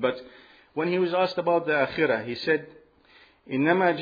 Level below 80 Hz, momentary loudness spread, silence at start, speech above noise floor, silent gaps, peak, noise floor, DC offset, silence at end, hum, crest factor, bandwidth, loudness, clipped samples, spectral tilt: -66 dBFS; 9 LU; 0 s; 32 dB; none; -8 dBFS; -57 dBFS; under 0.1%; 0 s; none; 18 dB; 5 kHz; -25 LUFS; under 0.1%; -7.5 dB/octave